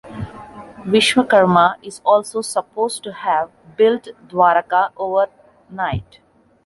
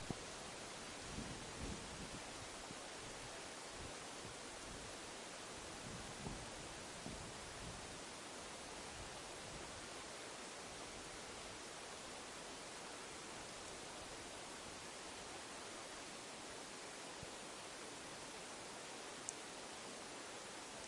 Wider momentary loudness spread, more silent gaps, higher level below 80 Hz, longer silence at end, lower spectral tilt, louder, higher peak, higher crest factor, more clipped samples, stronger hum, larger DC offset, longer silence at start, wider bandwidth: first, 18 LU vs 2 LU; neither; first, -48 dBFS vs -66 dBFS; first, 0.65 s vs 0 s; first, -4.5 dB/octave vs -2.5 dB/octave; first, -17 LUFS vs -50 LUFS; first, -2 dBFS vs -22 dBFS; second, 16 dB vs 28 dB; neither; neither; neither; about the same, 0.05 s vs 0 s; about the same, 12 kHz vs 12 kHz